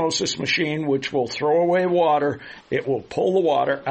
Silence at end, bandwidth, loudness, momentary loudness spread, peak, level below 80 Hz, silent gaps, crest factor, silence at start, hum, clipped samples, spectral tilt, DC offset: 0 s; 8.4 kHz; -21 LUFS; 7 LU; -8 dBFS; -60 dBFS; none; 12 dB; 0 s; none; under 0.1%; -4.5 dB/octave; under 0.1%